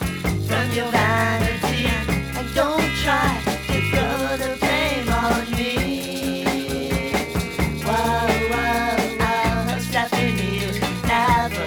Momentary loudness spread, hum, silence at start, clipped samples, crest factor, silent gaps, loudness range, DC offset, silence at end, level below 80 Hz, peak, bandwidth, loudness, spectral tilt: 5 LU; none; 0 s; under 0.1%; 18 dB; none; 2 LU; under 0.1%; 0 s; -34 dBFS; -4 dBFS; over 20 kHz; -21 LUFS; -5 dB/octave